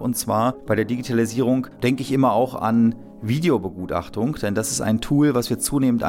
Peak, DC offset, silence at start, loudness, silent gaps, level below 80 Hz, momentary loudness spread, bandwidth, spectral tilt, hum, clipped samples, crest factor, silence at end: -8 dBFS; under 0.1%; 0 s; -21 LUFS; none; -46 dBFS; 6 LU; 17 kHz; -5.5 dB/octave; none; under 0.1%; 12 dB; 0 s